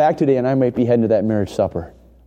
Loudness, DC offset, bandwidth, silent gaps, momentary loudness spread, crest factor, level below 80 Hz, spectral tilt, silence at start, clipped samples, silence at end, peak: -18 LUFS; under 0.1%; 9.6 kHz; none; 6 LU; 14 dB; -46 dBFS; -8.5 dB/octave; 0 s; under 0.1%; 0.35 s; -4 dBFS